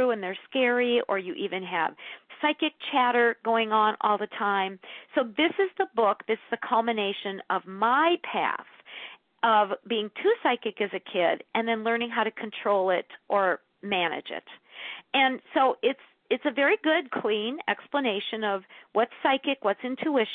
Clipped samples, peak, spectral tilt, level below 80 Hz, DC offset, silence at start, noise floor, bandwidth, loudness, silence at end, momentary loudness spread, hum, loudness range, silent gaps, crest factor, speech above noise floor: under 0.1%; -10 dBFS; -8 dB/octave; -82 dBFS; under 0.1%; 0 s; -45 dBFS; 4.4 kHz; -27 LUFS; 0 s; 10 LU; none; 2 LU; none; 18 dB; 19 dB